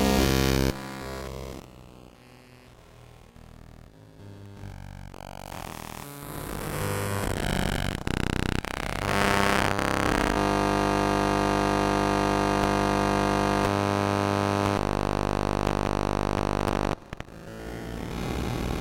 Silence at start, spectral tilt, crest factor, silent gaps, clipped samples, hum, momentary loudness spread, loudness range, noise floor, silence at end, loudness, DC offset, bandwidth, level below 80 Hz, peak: 0 s; -5 dB/octave; 22 dB; none; under 0.1%; none; 17 LU; 18 LU; -51 dBFS; 0 s; -26 LUFS; under 0.1%; 17 kHz; -38 dBFS; -4 dBFS